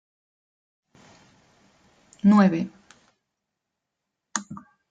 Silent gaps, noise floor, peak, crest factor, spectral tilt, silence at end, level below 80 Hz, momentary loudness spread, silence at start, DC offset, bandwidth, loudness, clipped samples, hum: none; -83 dBFS; -6 dBFS; 20 dB; -6 dB/octave; 0.3 s; -68 dBFS; 23 LU; 2.25 s; under 0.1%; 9 kHz; -22 LUFS; under 0.1%; none